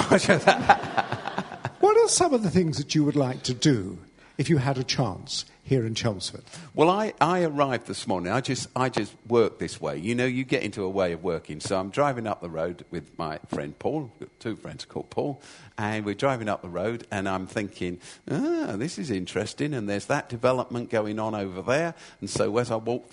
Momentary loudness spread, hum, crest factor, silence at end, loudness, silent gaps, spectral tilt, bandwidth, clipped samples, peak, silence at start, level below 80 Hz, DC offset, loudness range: 13 LU; none; 26 dB; 0.1 s; -26 LUFS; none; -5 dB/octave; 11 kHz; under 0.1%; -2 dBFS; 0 s; -58 dBFS; under 0.1%; 7 LU